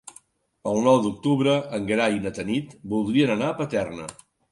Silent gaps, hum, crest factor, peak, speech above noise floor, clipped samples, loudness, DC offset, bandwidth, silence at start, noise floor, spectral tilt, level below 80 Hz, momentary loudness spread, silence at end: none; none; 18 dB; -6 dBFS; 32 dB; under 0.1%; -24 LUFS; under 0.1%; 11.5 kHz; 0.05 s; -55 dBFS; -6 dB/octave; -58 dBFS; 10 LU; 0.4 s